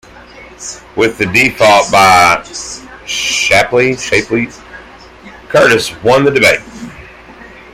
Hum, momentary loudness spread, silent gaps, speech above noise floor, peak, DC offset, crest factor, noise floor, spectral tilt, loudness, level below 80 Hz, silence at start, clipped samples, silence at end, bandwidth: none; 19 LU; none; 25 dB; 0 dBFS; under 0.1%; 12 dB; -35 dBFS; -3 dB/octave; -10 LUFS; -42 dBFS; 0.15 s; under 0.1%; 0.25 s; 17 kHz